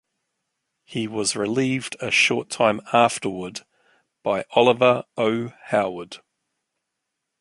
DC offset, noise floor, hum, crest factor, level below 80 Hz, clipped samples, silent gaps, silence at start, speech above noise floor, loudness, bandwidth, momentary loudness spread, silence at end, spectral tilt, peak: under 0.1%; -80 dBFS; none; 22 dB; -64 dBFS; under 0.1%; none; 0.9 s; 59 dB; -21 LUFS; 11.5 kHz; 15 LU; 1.25 s; -4 dB/octave; -2 dBFS